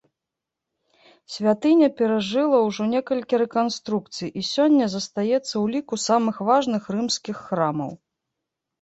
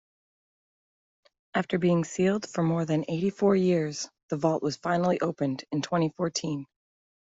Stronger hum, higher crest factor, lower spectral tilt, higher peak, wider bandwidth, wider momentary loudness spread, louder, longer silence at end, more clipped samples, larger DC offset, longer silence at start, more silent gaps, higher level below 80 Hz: neither; about the same, 16 dB vs 18 dB; about the same, -5 dB/octave vs -6 dB/octave; first, -6 dBFS vs -10 dBFS; about the same, 8.2 kHz vs 8 kHz; about the same, 9 LU vs 8 LU; first, -22 LUFS vs -28 LUFS; first, 0.85 s vs 0.65 s; neither; neither; second, 1.3 s vs 1.55 s; second, none vs 4.23-4.28 s; about the same, -66 dBFS vs -66 dBFS